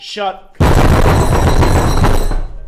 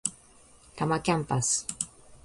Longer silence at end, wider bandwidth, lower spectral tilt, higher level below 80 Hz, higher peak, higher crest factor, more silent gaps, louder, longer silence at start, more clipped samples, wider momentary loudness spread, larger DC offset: about the same, 0 s vs 0.1 s; first, 15 kHz vs 11.5 kHz; first, -6 dB/octave vs -4 dB/octave; first, -14 dBFS vs -58 dBFS; first, -4 dBFS vs -8 dBFS; second, 6 dB vs 22 dB; neither; first, -13 LUFS vs -29 LUFS; about the same, 0 s vs 0.05 s; neither; about the same, 10 LU vs 10 LU; neither